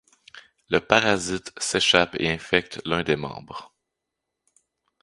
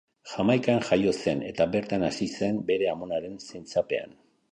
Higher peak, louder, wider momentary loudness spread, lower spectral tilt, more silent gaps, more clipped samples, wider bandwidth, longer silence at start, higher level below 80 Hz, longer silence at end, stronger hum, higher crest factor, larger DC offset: first, 0 dBFS vs -10 dBFS; first, -22 LUFS vs -27 LUFS; first, 15 LU vs 9 LU; second, -3 dB/octave vs -6 dB/octave; neither; neither; first, 11.5 kHz vs 10 kHz; about the same, 0.35 s vs 0.25 s; first, -52 dBFS vs -58 dBFS; first, 1.4 s vs 0.45 s; neither; first, 26 dB vs 18 dB; neither